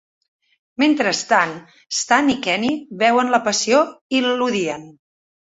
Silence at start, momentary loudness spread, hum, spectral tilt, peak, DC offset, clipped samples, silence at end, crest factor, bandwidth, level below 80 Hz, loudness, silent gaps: 0.8 s; 8 LU; none; -2.5 dB/octave; -2 dBFS; under 0.1%; under 0.1%; 0.55 s; 18 dB; 8 kHz; -62 dBFS; -18 LUFS; 4.01-4.09 s